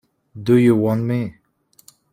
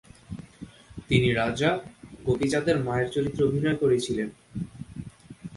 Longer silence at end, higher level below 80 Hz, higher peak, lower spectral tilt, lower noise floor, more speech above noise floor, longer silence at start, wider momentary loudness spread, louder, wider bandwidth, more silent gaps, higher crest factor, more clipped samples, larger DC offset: first, 0.8 s vs 0 s; second, -56 dBFS vs -50 dBFS; first, -4 dBFS vs -8 dBFS; first, -8.5 dB/octave vs -6 dB/octave; first, -57 dBFS vs -46 dBFS; first, 41 dB vs 22 dB; about the same, 0.35 s vs 0.3 s; second, 14 LU vs 21 LU; first, -18 LUFS vs -26 LUFS; first, 15.5 kHz vs 11.5 kHz; neither; about the same, 16 dB vs 20 dB; neither; neither